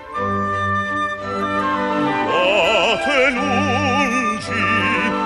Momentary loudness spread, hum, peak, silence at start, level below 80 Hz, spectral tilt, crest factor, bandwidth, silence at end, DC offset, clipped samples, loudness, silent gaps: 6 LU; none; -4 dBFS; 0 s; -48 dBFS; -4.5 dB/octave; 14 dB; 12 kHz; 0 s; under 0.1%; under 0.1%; -18 LUFS; none